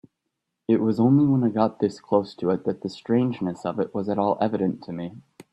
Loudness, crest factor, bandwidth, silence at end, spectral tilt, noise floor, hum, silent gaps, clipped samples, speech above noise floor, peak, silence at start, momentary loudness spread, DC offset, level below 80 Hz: -24 LUFS; 18 dB; 8.6 kHz; 0.1 s; -9 dB/octave; -81 dBFS; none; none; under 0.1%; 58 dB; -6 dBFS; 0.7 s; 14 LU; under 0.1%; -64 dBFS